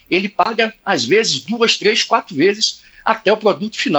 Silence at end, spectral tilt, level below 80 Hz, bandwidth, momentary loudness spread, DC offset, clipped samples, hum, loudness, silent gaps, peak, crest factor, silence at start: 0 s; -3 dB/octave; -62 dBFS; over 20 kHz; 5 LU; under 0.1%; under 0.1%; none; -16 LUFS; none; 0 dBFS; 16 dB; 0.1 s